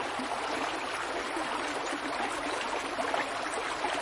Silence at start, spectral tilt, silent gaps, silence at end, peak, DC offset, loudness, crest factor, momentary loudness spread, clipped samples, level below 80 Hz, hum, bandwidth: 0 s; -2 dB/octave; none; 0 s; -16 dBFS; under 0.1%; -33 LUFS; 18 dB; 2 LU; under 0.1%; -62 dBFS; none; 11.5 kHz